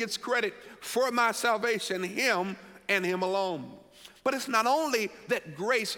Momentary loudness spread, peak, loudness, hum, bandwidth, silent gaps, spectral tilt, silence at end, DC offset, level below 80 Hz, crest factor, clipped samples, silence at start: 9 LU; -12 dBFS; -29 LUFS; none; 17.5 kHz; none; -3 dB/octave; 0 s; under 0.1%; -72 dBFS; 18 dB; under 0.1%; 0 s